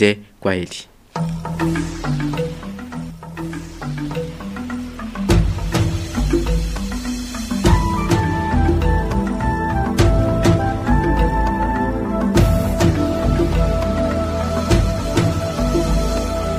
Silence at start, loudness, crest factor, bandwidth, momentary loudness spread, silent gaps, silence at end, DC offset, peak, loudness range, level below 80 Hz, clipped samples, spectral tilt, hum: 0 s; -19 LUFS; 18 dB; 15.5 kHz; 12 LU; none; 0 s; under 0.1%; 0 dBFS; 7 LU; -24 dBFS; under 0.1%; -6.5 dB/octave; none